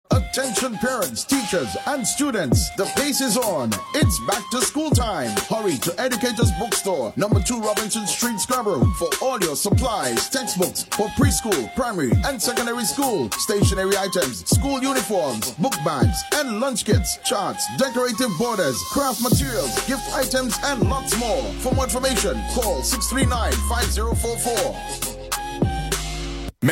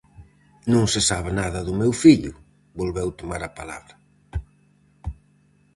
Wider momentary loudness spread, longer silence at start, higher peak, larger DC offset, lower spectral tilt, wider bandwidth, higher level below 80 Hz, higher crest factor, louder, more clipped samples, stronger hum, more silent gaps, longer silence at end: second, 4 LU vs 22 LU; about the same, 0.1 s vs 0.2 s; about the same, -4 dBFS vs -2 dBFS; neither; about the same, -4 dB/octave vs -5 dB/octave; first, 16.5 kHz vs 11.5 kHz; first, -32 dBFS vs -40 dBFS; second, 16 dB vs 22 dB; about the same, -21 LUFS vs -21 LUFS; neither; neither; neither; second, 0 s vs 0.65 s